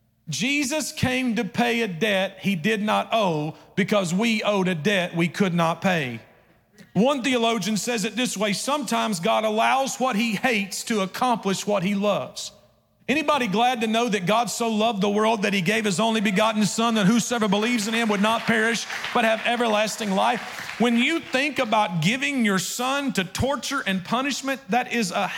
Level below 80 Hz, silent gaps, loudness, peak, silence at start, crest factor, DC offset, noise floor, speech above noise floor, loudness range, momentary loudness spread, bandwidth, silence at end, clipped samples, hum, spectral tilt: -60 dBFS; none; -23 LUFS; -10 dBFS; 0.25 s; 14 dB; under 0.1%; -59 dBFS; 36 dB; 3 LU; 5 LU; 17 kHz; 0 s; under 0.1%; none; -4 dB/octave